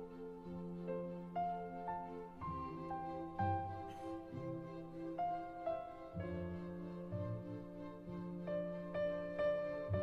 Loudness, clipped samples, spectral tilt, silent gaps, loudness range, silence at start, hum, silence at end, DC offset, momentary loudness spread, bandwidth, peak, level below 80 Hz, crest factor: -44 LUFS; under 0.1%; -9 dB/octave; none; 2 LU; 0 s; none; 0 s; under 0.1%; 10 LU; 7.6 kHz; -26 dBFS; -64 dBFS; 18 dB